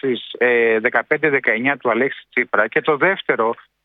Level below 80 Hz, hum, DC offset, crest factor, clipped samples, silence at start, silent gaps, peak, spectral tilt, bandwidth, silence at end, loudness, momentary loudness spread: -68 dBFS; none; under 0.1%; 18 dB; under 0.1%; 0.05 s; none; 0 dBFS; -8 dB/octave; 4.5 kHz; 0.3 s; -18 LUFS; 5 LU